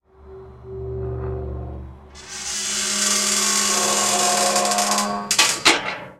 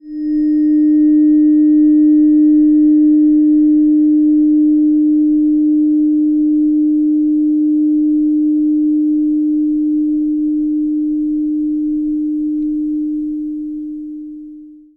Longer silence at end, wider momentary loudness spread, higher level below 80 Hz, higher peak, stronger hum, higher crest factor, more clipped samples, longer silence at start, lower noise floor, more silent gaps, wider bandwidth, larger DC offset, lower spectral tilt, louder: second, 0.05 s vs 0.25 s; first, 16 LU vs 9 LU; first, -40 dBFS vs -46 dBFS; first, 0 dBFS vs -6 dBFS; neither; first, 22 dB vs 8 dB; neither; first, 0.2 s vs 0.05 s; first, -42 dBFS vs -36 dBFS; neither; first, 17 kHz vs 2 kHz; neither; second, -1 dB/octave vs -10.5 dB/octave; second, -18 LUFS vs -13 LUFS